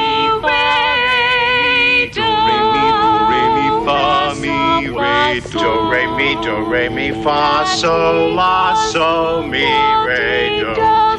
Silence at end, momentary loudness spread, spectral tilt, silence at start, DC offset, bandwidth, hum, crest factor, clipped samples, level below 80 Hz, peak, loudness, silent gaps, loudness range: 0 s; 4 LU; -4 dB/octave; 0 s; under 0.1%; 10.5 kHz; none; 10 dB; under 0.1%; -38 dBFS; -4 dBFS; -14 LUFS; none; 3 LU